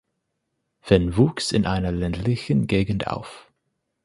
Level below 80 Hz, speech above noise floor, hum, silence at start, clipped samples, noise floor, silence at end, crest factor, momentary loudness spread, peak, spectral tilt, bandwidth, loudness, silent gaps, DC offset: -40 dBFS; 55 dB; none; 0.85 s; under 0.1%; -77 dBFS; 0.65 s; 22 dB; 8 LU; -2 dBFS; -6.5 dB/octave; 11.5 kHz; -22 LUFS; none; under 0.1%